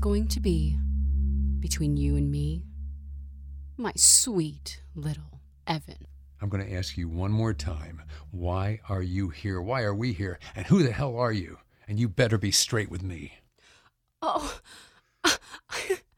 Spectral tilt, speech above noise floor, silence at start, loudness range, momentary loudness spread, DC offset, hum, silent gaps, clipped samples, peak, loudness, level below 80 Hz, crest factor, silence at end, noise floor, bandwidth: -4 dB/octave; 36 dB; 0 s; 8 LU; 18 LU; under 0.1%; none; none; under 0.1%; -6 dBFS; -27 LUFS; -36 dBFS; 22 dB; 0.2 s; -63 dBFS; 19 kHz